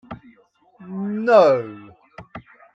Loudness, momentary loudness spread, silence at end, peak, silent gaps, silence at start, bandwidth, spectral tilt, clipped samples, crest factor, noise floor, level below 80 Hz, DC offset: -17 LUFS; 26 LU; 0.35 s; -2 dBFS; none; 0.1 s; 7.8 kHz; -7 dB/octave; under 0.1%; 20 dB; -56 dBFS; -60 dBFS; under 0.1%